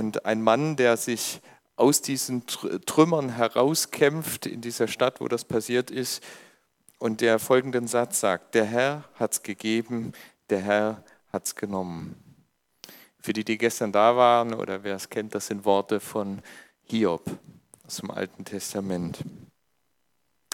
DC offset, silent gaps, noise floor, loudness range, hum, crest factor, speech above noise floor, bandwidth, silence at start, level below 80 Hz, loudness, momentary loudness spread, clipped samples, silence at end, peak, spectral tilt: under 0.1%; none; -76 dBFS; 7 LU; none; 22 dB; 50 dB; 18 kHz; 0 s; -68 dBFS; -26 LUFS; 14 LU; under 0.1%; 1.1 s; -4 dBFS; -4 dB/octave